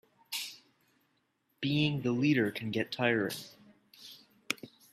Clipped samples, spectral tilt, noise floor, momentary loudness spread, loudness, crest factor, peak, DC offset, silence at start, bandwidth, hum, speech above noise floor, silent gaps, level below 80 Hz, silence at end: under 0.1%; -5 dB/octave; -76 dBFS; 22 LU; -32 LUFS; 24 dB; -10 dBFS; under 0.1%; 0.3 s; 15.5 kHz; none; 46 dB; none; -74 dBFS; 0.25 s